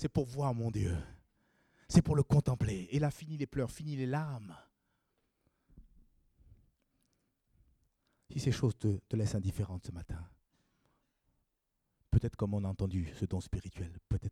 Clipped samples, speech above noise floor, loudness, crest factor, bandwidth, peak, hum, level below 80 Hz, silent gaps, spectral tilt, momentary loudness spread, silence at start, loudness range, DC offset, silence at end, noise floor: under 0.1%; 49 dB; -35 LUFS; 24 dB; 13.5 kHz; -12 dBFS; none; -52 dBFS; none; -7.5 dB/octave; 15 LU; 0 s; 9 LU; under 0.1%; 0 s; -83 dBFS